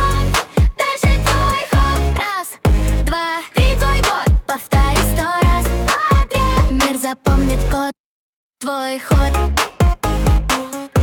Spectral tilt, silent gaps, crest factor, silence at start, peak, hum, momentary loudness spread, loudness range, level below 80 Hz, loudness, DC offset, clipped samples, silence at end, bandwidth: -5 dB/octave; 8.00-8.50 s; 12 dB; 0 s; -4 dBFS; none; 5 LU; 3 LU; -18 dBFS; -17 LUFS; under 0.1%; under 0.1%; 0 s; 18 kHz